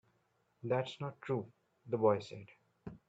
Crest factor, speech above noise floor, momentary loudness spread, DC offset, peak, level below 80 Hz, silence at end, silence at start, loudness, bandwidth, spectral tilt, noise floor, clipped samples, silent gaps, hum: 22 dB; 41 dB; 21 LU; under 0.1%; -16 dBFS; -76 dBFS; 0.1 s; 0.65 s; -37 LUFS; 8 kHz; -7.5 dB/octave; -77 dBFS; under 0.1%; none; none